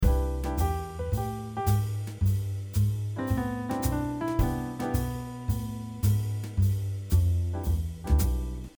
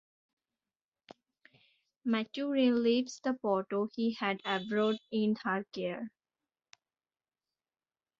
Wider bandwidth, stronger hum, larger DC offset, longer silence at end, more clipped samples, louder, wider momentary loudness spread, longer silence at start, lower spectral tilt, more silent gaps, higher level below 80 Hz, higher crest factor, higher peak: first, over 20 kHz vs 7.6 kHz; neither; neither; second, 0.1 s vs 2.1 s; neither; first, -29 LUFS vs -33 LUFS; second, 6 LU vs 9 LU; second, 0 s vs 2.05 s; first, -7 dB/octave vs -5.5 dB/octave; neither; first, -32 dBFS vs -80 dBFS; about the same, 16 dB vs 18 dB; first, -12 dBFS vs -16 dBFS